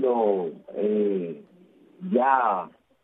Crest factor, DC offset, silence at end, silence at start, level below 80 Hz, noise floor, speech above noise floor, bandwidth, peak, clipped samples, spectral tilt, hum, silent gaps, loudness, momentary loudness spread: 20 dB; under 0.1%; 0.35 s; 0 s; -80 dBFS; -55 dBFS; 32 dB; 3.9 kHz; -6 dBFS; under 0.1%; -10 dB/octave; none; none; -25 LUFS; 17 LU